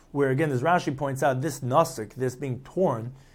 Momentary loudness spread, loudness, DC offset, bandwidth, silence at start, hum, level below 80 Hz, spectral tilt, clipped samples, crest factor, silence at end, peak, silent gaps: 8 LU; -26 LUFS; under 0.1%; 17 kHz; 0.15 s; none; -56 dBFS; -6.5 dB/octave; under 0.1%; 18 dB; 0.15 s; -8 dBFS; none